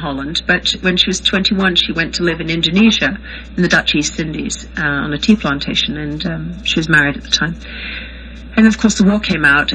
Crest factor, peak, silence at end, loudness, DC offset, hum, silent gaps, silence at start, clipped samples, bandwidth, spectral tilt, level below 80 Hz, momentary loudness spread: 16 dB; 0 dBFS; 0 s; -14 LUFS; under 0.1%; none; none; 0 s; under 0.1%; 9.8 kHz; -4 dB/octave; -34 dBFS; 11 LU